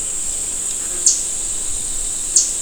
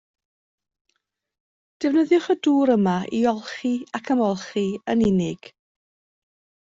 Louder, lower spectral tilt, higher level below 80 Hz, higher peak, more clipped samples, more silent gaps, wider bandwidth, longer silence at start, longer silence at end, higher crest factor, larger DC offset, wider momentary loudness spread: first, -17 LUFS vs -22 LUFS; second, 1 dB/octave vs -6.5 dB/octave; first, -36 dBFS vs -58 dBFS; first, 0 dBFS vs -8 dBFS; neither; neither; first, over 20 kHz vs 7.8 kHz; second, 0 s vs 1.8 s; second, 0 s vs 1.15 s; about the same, 20 dB vs 16 dB; neither; second, 6 LU vs 9 LU